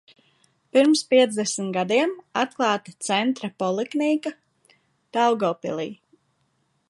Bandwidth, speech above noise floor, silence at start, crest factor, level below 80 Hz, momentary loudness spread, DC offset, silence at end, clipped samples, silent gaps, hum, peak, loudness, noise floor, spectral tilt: 11.5 kHz; 47 dB; 0.75 s; 20 dB; -76 dBFS; 11 LU; under 0.1%; 0.95 s; under 0.1%; none; none; -4 dBFS; -23 LUFS; -69 dBFS; -4 dB/octave